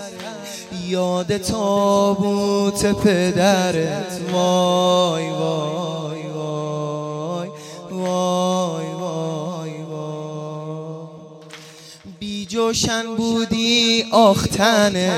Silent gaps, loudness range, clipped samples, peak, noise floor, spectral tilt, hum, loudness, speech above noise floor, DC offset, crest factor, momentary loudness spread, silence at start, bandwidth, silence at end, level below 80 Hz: none; 9 LU; under 0.1%; -2 dBFS; -41 dBFS; -4.5 dB/octave; none; -19 LUFS; 23 dB; under 0.1%; 18 dB; 17 LU; 0 s; 16 kHz; 0 s; -50 dBFS